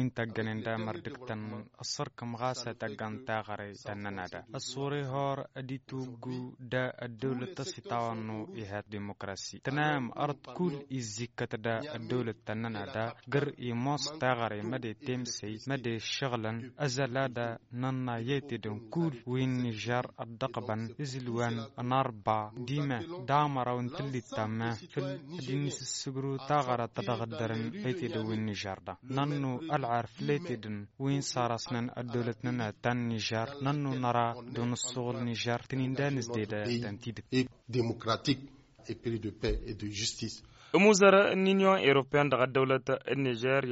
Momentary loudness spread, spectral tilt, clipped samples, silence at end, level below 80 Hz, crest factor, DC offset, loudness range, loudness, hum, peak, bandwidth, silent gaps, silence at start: 11 LU; -4.5 dB/octave; under 0.1%; 0 s; -58 dBFS; 22 dB; under 0.1%; 10 LU; -33 LUFS; none; -10 dBFS; 8 kHz; none; 0 s